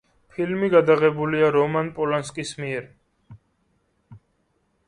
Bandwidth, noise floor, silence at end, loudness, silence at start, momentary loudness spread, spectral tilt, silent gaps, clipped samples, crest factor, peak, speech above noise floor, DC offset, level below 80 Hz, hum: 11 kHz; -69 dBFS; 0.7 s; -22 LUFS; 0.4 s; 13 LU; -6 dB/octave; none; under 0.1%; 20 dB; -4 dBFS; 48 dB; under 0.1%; -60 dBFS; none